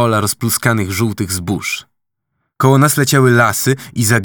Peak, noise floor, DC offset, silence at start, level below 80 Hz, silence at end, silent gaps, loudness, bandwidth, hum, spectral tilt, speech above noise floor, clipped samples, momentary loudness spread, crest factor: 0 dBFS; -72 dBFS; under 0.1%; 0 s; -50 dBFS; 0 s; none; -14 LUFS; over 20 kHz; none; -4.5 dB/octave; 59 dB; under 0.1%; 9 LU; 14 dB